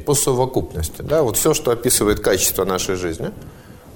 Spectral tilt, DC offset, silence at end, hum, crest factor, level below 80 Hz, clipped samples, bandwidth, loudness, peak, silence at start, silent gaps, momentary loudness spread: -3.5 dB/octave; under 0.1%; 0 s; none; 16 dB; -36 dBFS; under 0.1%; 17.5 kHz; -18 LUFS; -4 dBFS; 0 s; none; 11 LU